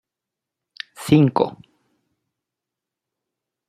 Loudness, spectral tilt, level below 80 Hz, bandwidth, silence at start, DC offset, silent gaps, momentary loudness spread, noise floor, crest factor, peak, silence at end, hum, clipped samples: -18 LUFS; -7.5 dB/octave; -62 dBFS; 15 kHz; 1 s; under 0.1%; none; 21 LU; -86 dBFS; 22 dB; -2 dBFS; 2.2 s; none; under 0.1%